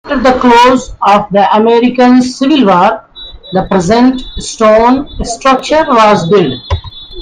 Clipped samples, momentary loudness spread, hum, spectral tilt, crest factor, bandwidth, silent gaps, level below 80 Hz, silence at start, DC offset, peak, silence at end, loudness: 0.4%; 13 LU; none; -5 dB/octave; 8 dB; 9.6 kHz; none; -30 dBFS; 0.05 s; under 0.1%; 0 dBFS; 0 s; -8 LUFS